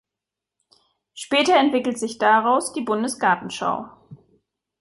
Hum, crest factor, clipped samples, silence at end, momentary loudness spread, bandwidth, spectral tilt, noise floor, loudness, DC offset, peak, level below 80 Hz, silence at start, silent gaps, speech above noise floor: none; 18 dB; under 0.1%; 0.65 s; 10 LU; 11.5 kHz; -3 dB/octave; -86 dBFS; -20 LUFS; under 0.1%; -4 dBFS; -68 dBFS; 1.15 s; none; 66 dB